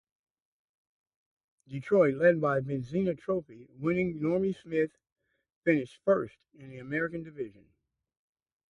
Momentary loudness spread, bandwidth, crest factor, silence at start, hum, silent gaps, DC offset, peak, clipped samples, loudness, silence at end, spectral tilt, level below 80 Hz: 17 LU; 10.5 kHz; 20 dB; 1.7 s; none; 5.12-5.16 s, 5.56-5.62 s; under 0.1%; -12 dBFS; under 0.1%; -30 LUFS; 1.2 s; -9 dB/octave; -68 dBFS